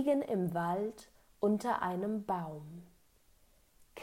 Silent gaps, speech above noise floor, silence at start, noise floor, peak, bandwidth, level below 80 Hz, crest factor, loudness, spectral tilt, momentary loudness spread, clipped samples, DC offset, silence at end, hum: none; 32 dB; 0 s; -66 dBFS; -20 dBFS; 16 kHz; -70 dBFS; 16 dB; -35 LUFS; -7.5 dB/octave; 20 LU; under 0.1%; under 0.1%; 0 s; none